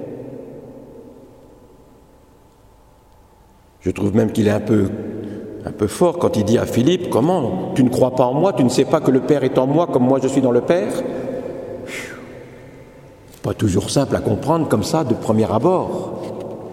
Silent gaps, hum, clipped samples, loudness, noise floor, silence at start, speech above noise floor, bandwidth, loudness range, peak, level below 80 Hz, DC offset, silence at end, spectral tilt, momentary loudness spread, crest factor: none; none; under 0.1%; -18 LUFS; -49 dBFS; 0 s; 33 dB; 16 kHz; 8 LU; 0 dBFS; -50 dBFS; under 0.1%; 0 s; -6.5 dB/octave; 15 LU; 18 dB